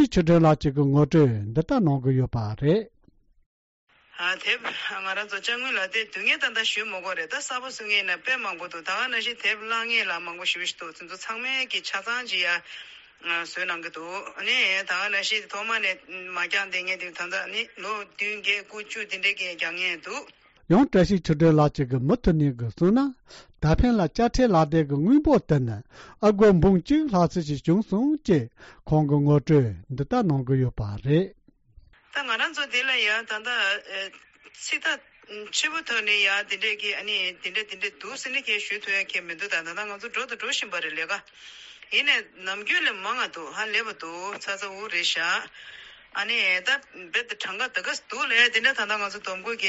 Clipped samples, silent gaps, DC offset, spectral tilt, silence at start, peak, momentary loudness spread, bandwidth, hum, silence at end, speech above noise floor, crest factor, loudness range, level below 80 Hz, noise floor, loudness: under 0.1%; 3.46-3.87 s; under 0.1%; -3.5 dB/octave; 0 s; -8 dBFS; 12 LU; 8 kHz; none; 0 s; 35 dB; 18 dB; 5 LU; -46 dBFS; -60 dBFS; -24 LUFS